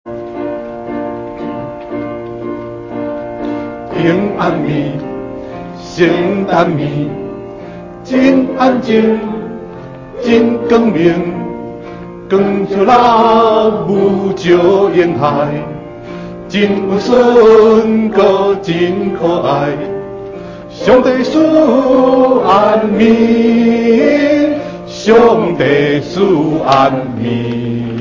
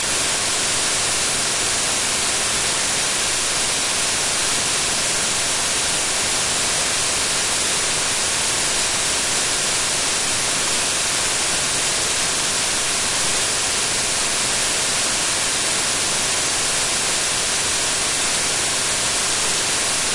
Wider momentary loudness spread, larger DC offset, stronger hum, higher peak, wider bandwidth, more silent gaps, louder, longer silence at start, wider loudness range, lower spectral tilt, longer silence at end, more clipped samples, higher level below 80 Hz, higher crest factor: first, 17 LU vs 0 LU; neither; neither; first, 0 dBFS vs -6 dBFS; second, 7.6 kHz vs 11.5 kHz; neither; first, -11 LUFS vs -17 LUFS; about the same, 0.05 s vs 0 s; first, 8 LU vs 0 LU; first, -7 dB/octave vs 0 dB/octave; about the same, 0 s vs 0 s; neither; about the same, -42 dBFS vs -44 dBFS; about the same, 12 dB vs 14 dB